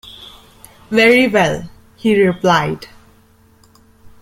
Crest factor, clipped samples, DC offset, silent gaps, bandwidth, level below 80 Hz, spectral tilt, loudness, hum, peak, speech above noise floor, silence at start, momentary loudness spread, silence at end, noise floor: 16 dB; under 0.1%; under 0.1%; none; 16 kHz; -48 dBFS; -5.5 dB/octave; -14 LUFS; none; -2 dBFS; 37 dB; 0.05 s; 18 LU; 1.35 s; -50 dBFS